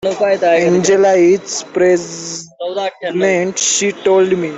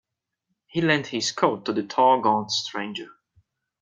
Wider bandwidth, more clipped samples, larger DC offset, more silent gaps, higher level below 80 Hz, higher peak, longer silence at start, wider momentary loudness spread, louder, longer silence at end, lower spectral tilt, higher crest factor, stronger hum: second, 8.4 kHz vs 9.4 kHz; neither; neither; neither; first, -58 dBFS vs -70 dBFS; first, -2 dBFS vs -6 dBFS; second, 0 s vs 0.75 s; about the same, 12 LU vs 12 LU; first, -14 LUFS vs -23 LUFS; second, 0 s vs 0.75 s; about the same, -3.5 dB/octave vs -4 dB/octave; second, 12 dB vs 20 dB; neither